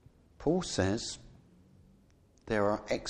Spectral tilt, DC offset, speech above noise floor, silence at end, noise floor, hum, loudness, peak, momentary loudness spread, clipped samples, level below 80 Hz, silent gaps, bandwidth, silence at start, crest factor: -5 dB/octave; under 0.1%; 32 dB; 0 s; -64 dBFS; none; -33 LUFS; -16 dBFS; 8 LU; under 0.1%; -56 dBFS; none; 11 kHz; 0.4 s; 20 dB